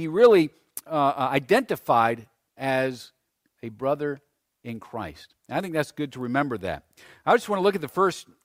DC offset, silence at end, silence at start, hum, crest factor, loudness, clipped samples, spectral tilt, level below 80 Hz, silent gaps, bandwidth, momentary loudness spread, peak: under 0.1%; 0.25 s; 0 s; none; 20 dB; -24 LUFS; under 0.1%; -5.5 dB/octave; -62 dBFS; none; 16 kHz; 18 LU; -6 dBFS